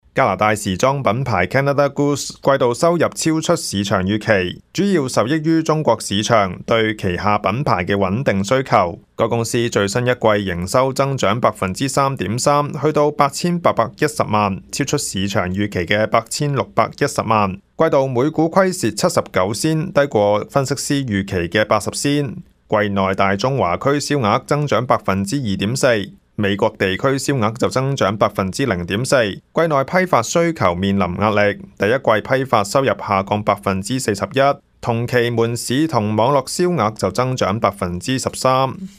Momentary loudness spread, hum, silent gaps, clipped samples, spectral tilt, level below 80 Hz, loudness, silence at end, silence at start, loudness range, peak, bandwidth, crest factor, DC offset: 4 LU; none; none; under 0.1%; -5 dB/octave; -50 dBFS; -18 LUFS; 0.1 s; 0.15 s; 1 LU; 0 dBFS; 15.5 kHz; 18 dB; under 0.1%